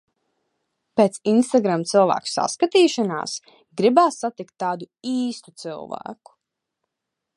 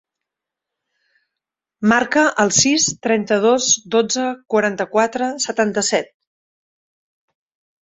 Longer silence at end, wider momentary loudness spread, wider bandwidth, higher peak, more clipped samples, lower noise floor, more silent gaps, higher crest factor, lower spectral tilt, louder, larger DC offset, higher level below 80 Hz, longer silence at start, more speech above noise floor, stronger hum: second, 1.25 s vs 1.8 s; first, 17 LU vs 7 LU; first, 11.5 kHz vs 8.2 kHz; about the same, -2 dBFS vs -2 dBFS; neither; about the same, -83 dBFS vs -84 dBFS; neither; about the same, 20 dB vs 18 dB; first, -4.5 dB/octave vs -2.5 dB/octave; second, -21 LUFS vs -17 LUFS; neither; second, -72 dBFS vs -60 dBFS; second, 0.95 s vs 1.8 s; second, 62 dB vs 67 dB; neither